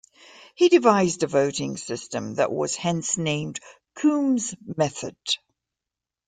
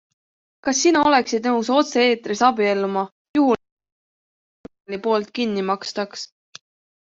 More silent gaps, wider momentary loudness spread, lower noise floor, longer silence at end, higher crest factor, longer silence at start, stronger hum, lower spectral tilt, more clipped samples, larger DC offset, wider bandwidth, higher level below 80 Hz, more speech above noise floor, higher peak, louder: second, none vs 3.12-3.34 s, 3.72-3.77 s, 3.92-4.64 s, 4.80-4.84 s; about the same, 13 LU vs 11 LU; about the same, -88 dBFS vs under -90 dBFS; about the same, 0.9 s vs 0.8 s; about the same, 20 dB vs 18 dB; second, 0.4 s vs 0.65 s; neither; about the same, -4.5 dB/octave vs -3.5 dB/octave; neither; neither; first, 9.6 kHz vs 8 kHz; about the same, -64 dBFS vs -64 dBFS; second, 65 dB vs over 70 dB; about the same, -4 dBFS vs -4 dBFS; second, -23 LUFS vs -20 LUFS